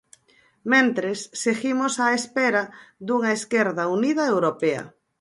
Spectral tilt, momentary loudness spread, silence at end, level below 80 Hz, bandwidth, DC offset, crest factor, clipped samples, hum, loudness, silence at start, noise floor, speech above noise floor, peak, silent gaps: -4 dB/octave; 11 LU; 0.3 s; -72 dBFS; 11.5 kHz; under 0.1%; 18 dB; under 0.1%; none; -22 LUFS; 0.65 s; -60 dBFS; 38 dB; -6 dBFS; none